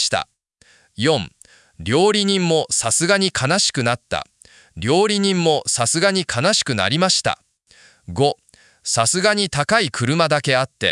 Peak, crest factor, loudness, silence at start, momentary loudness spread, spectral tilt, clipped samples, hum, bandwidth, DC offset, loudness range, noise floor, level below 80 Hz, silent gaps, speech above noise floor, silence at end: 0 dBFS; 18 dB; -18 LUFS; 0 s; 11 LU; -3 dB/octave; under 0.1%; none; 12 kHz; under 0.1%; 2 LU; -55 dBFS; -54 dBFS; none; 37 dB; 0 s